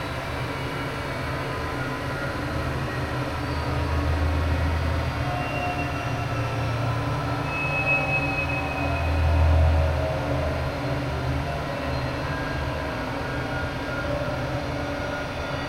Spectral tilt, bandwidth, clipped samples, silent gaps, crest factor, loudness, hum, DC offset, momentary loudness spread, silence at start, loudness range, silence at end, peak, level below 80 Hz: -6.5 dB/octave; 15.5 kHz; under 0.1%; none; 16 dB; -26 LUFS; none; under 0.1%; 7 LU; 0 s; 5 LU; 0 s; -10 dBFS; -32 dBFS